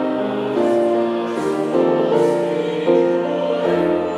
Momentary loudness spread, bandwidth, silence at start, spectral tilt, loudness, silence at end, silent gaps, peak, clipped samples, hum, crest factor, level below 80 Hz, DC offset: 5 LU; 11.5 kHz; 0 s; -7 dB/octave; -18 LUFS; 0 s; none; -4 dBFS; under 0.1%; none; 14 dB; -62 dBFS; under 0.1%